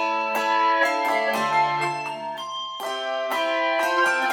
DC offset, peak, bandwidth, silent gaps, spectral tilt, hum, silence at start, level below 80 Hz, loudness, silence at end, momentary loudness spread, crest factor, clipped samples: under 0.1%; -10 dBFS; 19.5 kHz; none; -2.5 dB/octave; none; 0 s; -80 dBFS; -23 LUFS; 0 s; 10 LU; 14 dB; under 0.1%